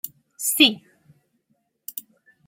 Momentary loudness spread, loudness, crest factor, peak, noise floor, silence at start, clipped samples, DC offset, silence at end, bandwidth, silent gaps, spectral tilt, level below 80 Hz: 22 LU; -18 LUFS; 24 dB; -2 dBFS; -71 dBFS; 0.05 s; under 0.1%; under 0.1%; 0.45 s; 16.5 kHz; none; -0.5 dB/octave; -76 dBFS